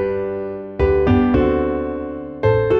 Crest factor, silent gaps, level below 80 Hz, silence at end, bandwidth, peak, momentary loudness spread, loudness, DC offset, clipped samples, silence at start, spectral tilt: 14 dB; none; -30 dBFS; 0 s; 6 kHz; -4 dBFS; 12 LU; -19 LUFS; under 0.1%; under 0.1%; 0 s; -10 dB/octave